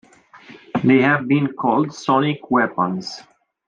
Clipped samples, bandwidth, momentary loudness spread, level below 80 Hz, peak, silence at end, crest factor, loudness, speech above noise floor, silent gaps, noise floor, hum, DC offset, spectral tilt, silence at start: under 0.1%; 7.6 kHz; 12 LU; -64 dBFS; -4 dBFS; 0.5 s; 16 dB; -19 LUFS; 27 dB; none; -45 dBFS; none; under 0.1%; -6.5 dB/octave; 0.35 s